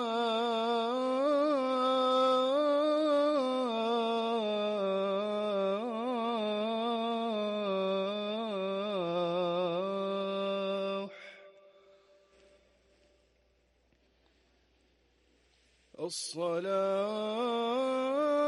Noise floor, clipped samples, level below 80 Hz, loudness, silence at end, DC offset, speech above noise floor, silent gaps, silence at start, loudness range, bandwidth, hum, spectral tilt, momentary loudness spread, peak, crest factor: -71 dBFS; under 0.1%; -80 dBFS; -32 LUFS; 0 s; under 0.1%; 38 dB; none; 0 s; 11 LU; 11.5 kHz; none; -5 dB/octave; 6 LU; -20 dBFS; 12 dB